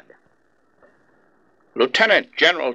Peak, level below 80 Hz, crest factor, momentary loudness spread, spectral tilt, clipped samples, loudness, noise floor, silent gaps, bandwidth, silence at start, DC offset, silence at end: -2 dBFS; -68 dBFS; 20 dB; 9 LU; -2.5 dB/octave; under 0.1%; -17 LUFS; -63 dBFS; none; 12 kHz; 1.75 s; under 0.1%; 0 s